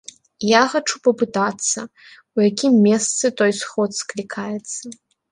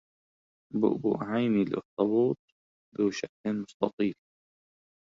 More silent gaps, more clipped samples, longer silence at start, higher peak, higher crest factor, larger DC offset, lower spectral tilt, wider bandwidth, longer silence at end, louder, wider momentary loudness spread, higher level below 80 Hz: second, none vs 1.85-1.97 s, 2.39-2.92 s, 3.29-3.44 s, 3.74-3.80 s, 3.93-3.98 s; neither; second, 0.4 s vs 0.75 s; first, -2 dBFS vs -10 dBFS; about the same, 18 dB vs 20 dB; neither; second, -3.5 dB/octave vs -7 dB/octave; first, 11.5 kHz vs 7.6 kHz; second, 0.4 s vs 0.9 s; first, -19 LUFS vs -30 LUFS; first, 13 LU vs 8 LU; about the same, -66 dBFS vs -70 dBFS